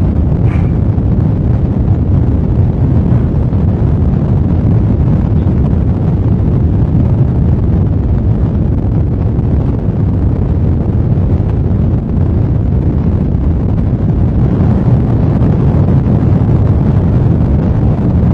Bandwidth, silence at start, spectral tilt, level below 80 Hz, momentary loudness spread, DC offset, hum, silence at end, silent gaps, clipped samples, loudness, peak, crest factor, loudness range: 4.2 kHz; 0 s; -11.5 dB/octave; -18 dBFS; 3 LU; under 0.1%; none; 0 s; none; under 0.1%; -12 LUFS; 0 dBFS; 10 dB; 2 LU